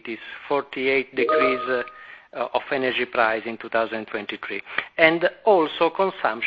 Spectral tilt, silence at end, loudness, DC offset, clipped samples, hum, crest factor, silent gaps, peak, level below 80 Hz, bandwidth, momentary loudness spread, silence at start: -7 dB/octave; 0 s; -22 LUFS; under 0.1%; under 0.1%; none; 24 dB; none; 0 dBFS; -62 dBFS; 5.4 kHz; 13 LU; 0.05 s